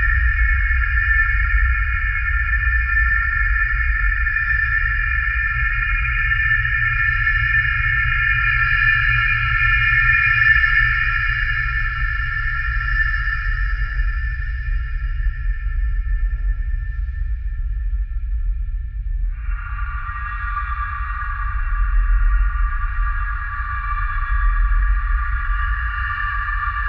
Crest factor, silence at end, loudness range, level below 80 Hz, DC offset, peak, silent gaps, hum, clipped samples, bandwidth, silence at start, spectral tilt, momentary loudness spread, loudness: 16 dB; 0 s; 11 LU; -22 dBFS; under 0.1%; -2 dBFS; none; none; under 0.1%; 5.6 kHz; 0 s; -5.5 dB/octave; 12 LU; -19 LUFS